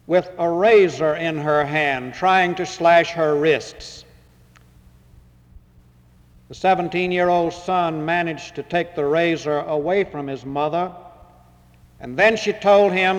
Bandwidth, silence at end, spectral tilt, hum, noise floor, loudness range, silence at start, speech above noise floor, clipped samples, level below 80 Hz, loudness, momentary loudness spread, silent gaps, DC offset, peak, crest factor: 10.5 kHz; 0 s; -5.5 dB/octave; 60 Hz at -50 dBFS; -52 dBFS; 8 LU; 0.1 s; 33 dB; under 0.1%; -54 dBFS; -19 LUFS; 11 LU; none; under 0.1%; -4 dBFS; 16 dB